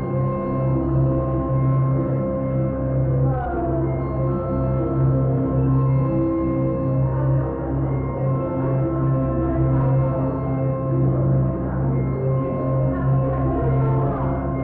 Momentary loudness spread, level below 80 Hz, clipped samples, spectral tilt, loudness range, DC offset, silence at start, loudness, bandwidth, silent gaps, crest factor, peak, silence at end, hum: 4 LU; -32 dBFS; under 0.1%; -14.5 dB/octave; 1 LU; under 0.1%; 0 s; -21 LUFS; 2.8 kHz; none; 10 dB; -10 dBFS; 0 s; none